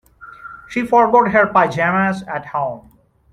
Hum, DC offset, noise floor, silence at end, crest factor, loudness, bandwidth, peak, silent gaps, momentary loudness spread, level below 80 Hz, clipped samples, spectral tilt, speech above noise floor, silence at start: none; under 0.1%; -38 dBFS; 0.5 s; 16 dB; -16 LUFS; 12 kHz; -2 dBFS; none; 23 LU; -52 dBFS; under 0.1%; -7 dB/octave; 22 dB; 0.2 s